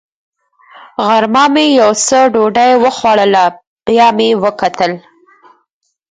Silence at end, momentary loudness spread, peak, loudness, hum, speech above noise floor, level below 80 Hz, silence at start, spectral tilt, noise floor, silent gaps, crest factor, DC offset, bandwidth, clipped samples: 1.1 s; 8 LU; 0 dBFS; -10 LUFS; none; 36 dB; -54 dBFS; 1 s; -3 dB/octave; -46 dBFS; 3.67-3.76 s; 12 dB; under 0.1%; 9.6 kHz; under 0.1%